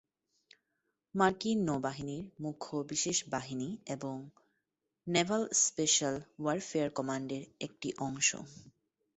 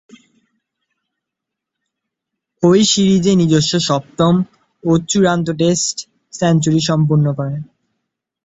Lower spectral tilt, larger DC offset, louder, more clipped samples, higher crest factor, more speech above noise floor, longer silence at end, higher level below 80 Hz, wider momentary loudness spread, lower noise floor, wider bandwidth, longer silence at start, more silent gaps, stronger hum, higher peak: second, -3 dB/octave vs -5 dB/octave; neither; second, -33 LUFS vs -15 LUFS; neither; first, 22 dB vs 16 dB; second, 51 dB vs 67 dB; second, 0.45 s vs 0.85 s; second, -70 dBFS vs -52 dBFS; about the same, 14 LU vs 12 LU; first, -85 dBFS vs -81 dBFS; about the same, 8.2 kHz vs 8.2 kHz; second, 1.15 s vs 2.6 s; neither; neither; second, -12 dBFS vs -2 dBFS